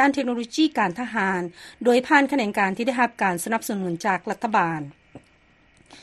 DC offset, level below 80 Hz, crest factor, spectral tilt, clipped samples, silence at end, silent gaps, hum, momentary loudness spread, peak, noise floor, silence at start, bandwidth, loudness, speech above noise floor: under 0.1%; -64 dBFS; 22 dB; -4.5 dB/octave; under 0.1%; 0.05 s; none; none; 8 LU; -2 dBFS; -58 dBFS; 0 s; 13 kHz; -23 LUFS; 35 dB